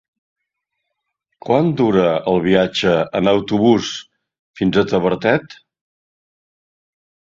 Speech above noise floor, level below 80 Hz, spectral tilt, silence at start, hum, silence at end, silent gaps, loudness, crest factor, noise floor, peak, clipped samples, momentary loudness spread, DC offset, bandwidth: 61 dB; -50 dBFS; -6 dB/octave; 1.45 s; none; 1.85 s; 4.39-4.54 s; -16 LUFS; 18 dB; -77 dBFS; -2 dBFS; under 0.1%; 6 LU; under 0.1%; 7.8 kHz